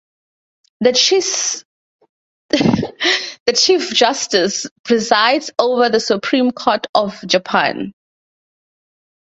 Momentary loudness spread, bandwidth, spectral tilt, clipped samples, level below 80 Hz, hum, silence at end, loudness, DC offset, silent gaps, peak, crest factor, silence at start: 7 LU; 8.2 kHz; -2.5 dB/octave; under 0.1%; -54 dBFS; none; 1.45 s; -15 LUFS; under 0.1%; 1.65-1.99 s, 2.09-2.49 s, 3.40-3.46 s, 4.71-4.84 s, 6.89-6.93 s; 0 dBFS; 18 dB; 0.8 s